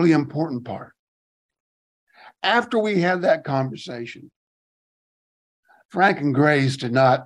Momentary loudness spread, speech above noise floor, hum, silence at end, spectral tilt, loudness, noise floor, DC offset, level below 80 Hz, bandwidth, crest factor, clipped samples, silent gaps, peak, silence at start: 15 LU; over 70 dB; none; 0 s; -6.5 dB/octave; -21 LUFS; under -90 dBFS; under 0.1%; -68 dBFS; 11 kHz; 18 dB; under 0.1%; 0.99-1.49 s, 1.60-2.07 s, 4.36-5.63 s, 5.85-5.89 s; -4 dBFS; 0 s